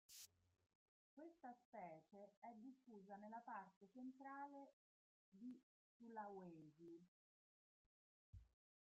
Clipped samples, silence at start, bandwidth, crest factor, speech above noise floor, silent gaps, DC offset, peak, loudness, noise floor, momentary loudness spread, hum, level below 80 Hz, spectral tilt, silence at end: under 0.1%; 0.1 s; 7.4 kHz; 20 dB; over 30 dB; 0.75-1.17 s, 1.65-1.72 s, 2.37-2.42 s, 3.76-3.81 s, 4.73-5.32 s, 5.63-6.00 s, 7.08-8.33 s; under 0.1%; -42 dBFS; -61 LUFS; under -90 dBFS; 9 LU; none; -86 dBFS; -4.5 dB/octave; 0.45 s